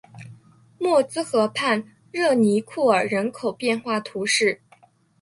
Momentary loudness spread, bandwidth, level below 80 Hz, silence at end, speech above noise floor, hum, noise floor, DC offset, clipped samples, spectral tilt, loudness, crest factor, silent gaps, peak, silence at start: 8 LU; 11.5 kHz; -68 dBFS; 0.65 s; 35 dB; none; -56 dBFS; under 0.1%; under 0.1%; -4 dB/octave; -22 LUFS; 18 dB; none; -6 dBFS; 0.15 s